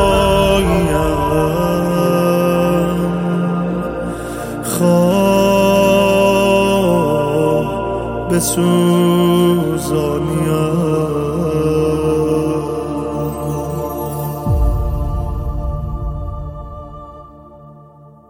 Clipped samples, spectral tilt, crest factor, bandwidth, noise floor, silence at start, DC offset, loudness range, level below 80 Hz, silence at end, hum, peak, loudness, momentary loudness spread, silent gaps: under 0.1%; -6 dB/octave; 14 dB; 16.5 kHz; -42 dBFS; 0 s; under 0.1%; 8 LU; -28 dBFS; 0.2 s; none; -2 dBFS; -15 LUFS; 11 LU; none